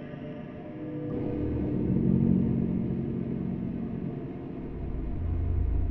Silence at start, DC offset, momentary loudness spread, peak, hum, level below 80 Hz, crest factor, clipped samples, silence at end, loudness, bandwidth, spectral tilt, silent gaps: 0 s; under 0.1%; 14 LU; -12 dBFS; none; -38 dBFS; 16 dB; under 0.1%; 0 s; -31 LUFS; 3.8 kHz; -12.5 dB/octave; none